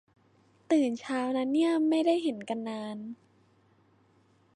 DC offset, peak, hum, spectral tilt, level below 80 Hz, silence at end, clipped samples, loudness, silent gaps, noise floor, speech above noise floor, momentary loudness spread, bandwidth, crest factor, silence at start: under 0.1%; -14 dBFS; none; -5 dB/octave; -82 dBFS; 1.4 s; under 0.1%; -29 LUFS; none; -65 dBFS; 37 dB; 14 LU; 10.5 kHz; 16 dB; 0.7 s